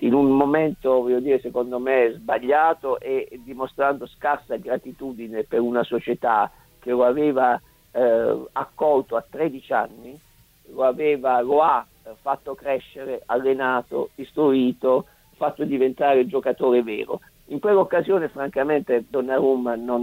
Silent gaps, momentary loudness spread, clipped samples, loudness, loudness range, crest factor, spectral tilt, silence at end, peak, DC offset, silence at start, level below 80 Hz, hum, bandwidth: none; 11 LU; under 0.1%; -22 LUFS; 3 LU; 18 dB; -7 dB/octave; 0 s; -4 dBFS; under 0.1%; 0 s; -58 dBFS; none; 16 kHz